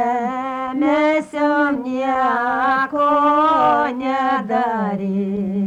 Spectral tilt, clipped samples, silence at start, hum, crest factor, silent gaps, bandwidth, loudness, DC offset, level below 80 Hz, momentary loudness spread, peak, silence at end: -7 dB/octave; under 0.1%; 0 s; none; 10 dB; none; 9.8 kHz; -18 LUFS; under 0.1%; -56 dBFS; 7 LU; -6 dBFS; 0 s